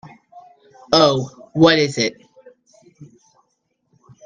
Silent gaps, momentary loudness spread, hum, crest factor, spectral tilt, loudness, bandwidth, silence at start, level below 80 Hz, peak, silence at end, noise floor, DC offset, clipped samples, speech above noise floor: none; 10 LU; none; 20 dB; -4.5 dB/octave; -16 LUFS; 9.4 kHz; 0.35 s; -58 dBFS; 0 dBFS; 1.2 s; -70 dBFS; under 0.1%; under 0.1%; 55 dB